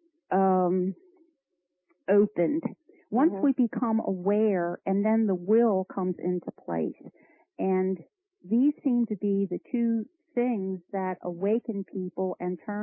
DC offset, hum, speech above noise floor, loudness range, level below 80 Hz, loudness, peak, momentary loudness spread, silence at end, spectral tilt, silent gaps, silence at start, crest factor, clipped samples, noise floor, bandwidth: under 0.1%; none; 55 dB; 4 LU; -82 dBFS; -28 LUFS; -12 dBFS; 9 LU; 0 s; -13 dB/octave; none; 0.3 s; 16 dB; under 0.1%; -82 dBFS; 3.2 kHz